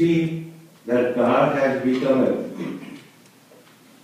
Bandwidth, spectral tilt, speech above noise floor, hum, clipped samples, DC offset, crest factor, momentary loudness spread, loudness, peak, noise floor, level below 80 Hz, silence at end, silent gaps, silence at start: 15 kHz; -7.5 dB/octave; 30 dB; none; under 0.1%; under 0.1%; 16 dB; 19 LU; -21 LUFS; -6 dBFS; -51 dBFS; -64 dBFS; 1 s; none; 0 s